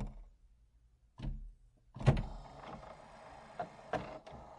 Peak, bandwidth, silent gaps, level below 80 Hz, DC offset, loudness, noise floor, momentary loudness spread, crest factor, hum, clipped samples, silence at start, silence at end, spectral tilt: -12 dBFS; 10.5 kHz; none; -48 dBFS; under 0.1%; -41 LUFS; -68 dBFS; 21 LU; 28 dB; none; under 0.1%; 0 s; 0 s; -7.5 dB/octave